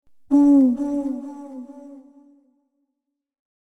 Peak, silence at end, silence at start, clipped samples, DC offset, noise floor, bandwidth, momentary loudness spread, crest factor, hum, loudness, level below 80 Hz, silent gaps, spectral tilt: -8 dBFS; 1.75 s; 0.3 s; under 0.1%; under 0.1%; -79 dBFS; 8 kHz; 23 LU; 16 dB; none; -18 LUFS; -60 dBFS; none; -8 dB/octave